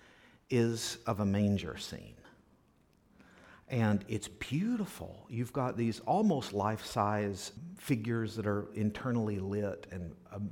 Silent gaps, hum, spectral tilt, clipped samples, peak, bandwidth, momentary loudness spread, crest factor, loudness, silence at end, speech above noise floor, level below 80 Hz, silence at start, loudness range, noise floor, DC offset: none; none; -6 dB/octave; under 0.1%; -16 dBFS; 18 kHz; 13 LU; 18 dB; -34 LUFS; 0 s; 34 dB; -62 dBFS; 0.5 s; 4 LU; -68 dBFS; under 0.1%